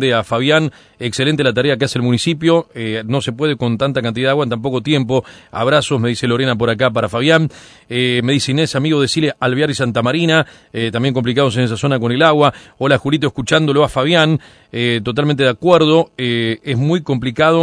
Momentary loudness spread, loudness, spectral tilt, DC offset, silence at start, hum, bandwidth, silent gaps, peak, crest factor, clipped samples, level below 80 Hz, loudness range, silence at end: 7 LU; -15 LUFS; -5.5 dB/octave; under 0.1%; 0 s; none; 11 kHz; none; 0 dBFS; 16 dB; under 0.1%; -48 dBFS; 2 LU; 0 s